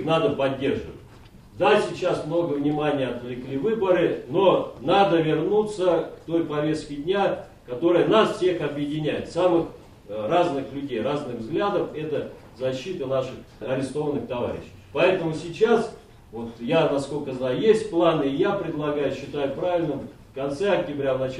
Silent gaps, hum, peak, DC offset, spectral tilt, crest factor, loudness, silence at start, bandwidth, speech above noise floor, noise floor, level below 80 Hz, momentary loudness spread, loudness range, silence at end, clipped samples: none; none; -6 dBFS; under 0.1%; -6.5 dB/octave; 18 dB; -24 LUFS; 0 s; 11.5 kHz; 24 dB; -47 dBFS; -54 dBFS; 11 LU; 5 LU; 0 s; under 0.1%